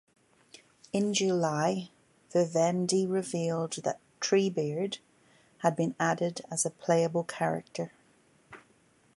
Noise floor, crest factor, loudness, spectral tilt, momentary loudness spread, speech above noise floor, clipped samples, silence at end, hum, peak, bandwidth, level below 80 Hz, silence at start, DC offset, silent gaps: -65 dBFS; 20 dB; -30 LUFS; -4.5 dB/octave; 9 LU; 36 dB; under 0.1%; 0.6 s; none; -12 dBFS; 11.5 kHz; -76 dBFS; 0.95 s; under 0.1%; none